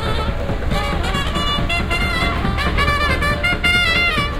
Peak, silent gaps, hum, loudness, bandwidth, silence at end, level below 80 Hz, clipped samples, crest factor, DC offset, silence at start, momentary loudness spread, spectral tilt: -4 dBFS; none; none; -18 LUFS; 16 kHz; 0 s; -24 dBFS; under 0.1%; 14 dB; under 0.1%; 0 s; 7 LU; -4.5 dB/octave